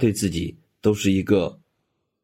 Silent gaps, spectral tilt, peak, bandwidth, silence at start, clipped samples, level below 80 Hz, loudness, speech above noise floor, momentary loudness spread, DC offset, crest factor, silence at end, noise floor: none; -6 dB/octave; -6 dBFS; 16.5 kHz; 0 s; under 0.1%; -52 dBFS; -23 LUFS; 53 dB; 10 LU; under 0.1%; 18 dB; 0.7 s; -75 dBFS